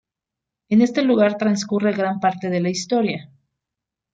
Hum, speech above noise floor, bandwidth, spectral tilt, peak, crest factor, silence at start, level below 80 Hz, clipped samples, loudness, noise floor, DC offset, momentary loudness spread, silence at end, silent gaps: none; 66 dB; 9 kHz; -5.5 dB/octave; -6 dBFS; 16 dB; 0.7 s; -64 dBFS; under 0.1%; -20 LUFS; -85 dBFS; under 0.1%; 5 LU; 0.9 s; none